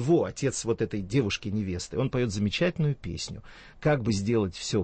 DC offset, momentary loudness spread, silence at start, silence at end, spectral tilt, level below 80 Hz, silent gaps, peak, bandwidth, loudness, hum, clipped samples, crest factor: under 0.1%; 7 LU; 0 s; 0 s; -5.5 dB/octave; -50 dBFS; none; -12 dBFS; 8.8 kHz; -28 LUFS; none; under 0.1%; 16 dB